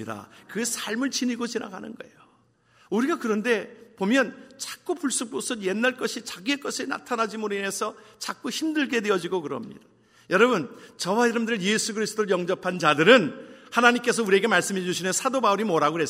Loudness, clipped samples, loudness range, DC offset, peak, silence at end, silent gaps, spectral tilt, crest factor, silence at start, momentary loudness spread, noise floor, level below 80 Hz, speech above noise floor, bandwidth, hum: -24 LUFS; under 0.1%; 7 LU; under 0.1%; -2 dBFS; 0 s; none; -3.5 dB/octave; 24 dB; 0 s; 15 LU; -62 dBFS; -74 dBFS; 37 dB; 16 kHz; none